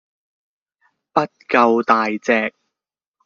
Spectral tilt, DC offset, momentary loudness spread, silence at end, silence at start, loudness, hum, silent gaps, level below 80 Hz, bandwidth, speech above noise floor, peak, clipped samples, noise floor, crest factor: -3 dB/octave; under 0.1%; 7 LU; 0.75 s; 1.15 s; -18 LUFS; none; none; -68 dBFS; 7.2 kHz; 70 dB; -2 dBFS; under 0.1%; -87 dBFS; 20 dB